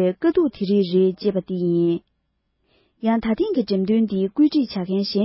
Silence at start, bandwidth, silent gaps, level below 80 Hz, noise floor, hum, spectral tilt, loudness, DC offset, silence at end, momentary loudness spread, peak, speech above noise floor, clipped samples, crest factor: 0 s; 5.8 kHz; none; -56 dBFS; -72 dBFS; none; -11 dB/octave; -21 LUFS; under 0.1%; 0 s; 5 LU; -8 dBFS; 52 dB; under 0.1%; 14 dB